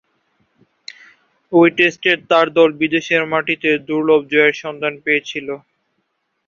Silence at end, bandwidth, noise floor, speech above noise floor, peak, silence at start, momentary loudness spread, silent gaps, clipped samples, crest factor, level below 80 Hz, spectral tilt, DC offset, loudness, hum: 0.9 s; 7.2 kHz; -70 dBFS; 54 dB; 0 dBFS; 1.5 s; 15 LU; none; under 0.1%; 18 dB; -62 dBFS; -5 dB/octave; under 0.1%; -15 LUFS; none